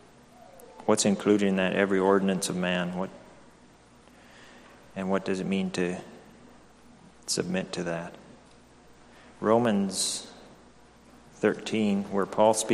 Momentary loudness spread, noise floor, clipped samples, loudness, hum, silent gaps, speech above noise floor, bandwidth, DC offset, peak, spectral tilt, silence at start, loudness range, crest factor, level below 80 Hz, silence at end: 13 LU; -56 dBFS; under 0.1%; -27 LUFS; 60 Hz at -60 dBFS; none; 29 dB; 13.5 kHz; under 0.1%; -8 dBFS; -4.5 dB/octave; 0.55 s; 8 LU; 22 dB; -64 dBFS; 0 s